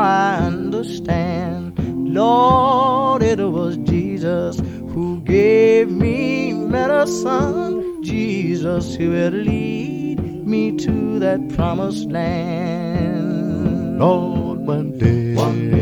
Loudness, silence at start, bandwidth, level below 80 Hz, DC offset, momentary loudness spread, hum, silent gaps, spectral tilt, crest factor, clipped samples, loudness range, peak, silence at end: -18 LUFS; 0 s; 16 kHz; -38 dBFS; under 0.1%; 10 LU; none; none; -7.5 dB/octave; 16 dB; under 0.1%; 4 LU; 0 dBFS; 0 s